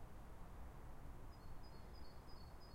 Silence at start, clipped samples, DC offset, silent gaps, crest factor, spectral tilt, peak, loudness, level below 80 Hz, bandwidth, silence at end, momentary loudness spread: 0 s; under 0.1%; under 0.1%; none; 12 dB; -6 dB/octave; -42 dBFS; -60 LUFS; -58 dBFS; 16 kHz; 0 s; 1 LU